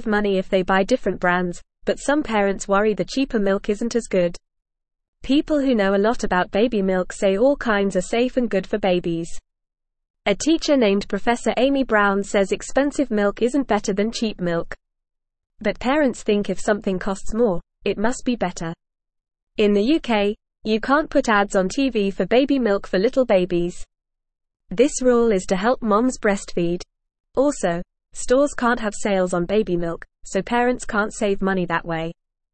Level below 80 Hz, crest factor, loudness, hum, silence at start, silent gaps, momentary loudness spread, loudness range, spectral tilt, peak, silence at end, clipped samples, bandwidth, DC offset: -42 dBFS; 16 dB; -21 LUFS; none; 0 s; 5.08-5.13 s, 10.10-10.14 s, 19.42-19.47 s, 27.20-27.24 s; 9 LU; 3 LU; -5 dB/octave; -4 dBFS; 0.4 s; under 0.1%; 8.8 kHz; 0.5%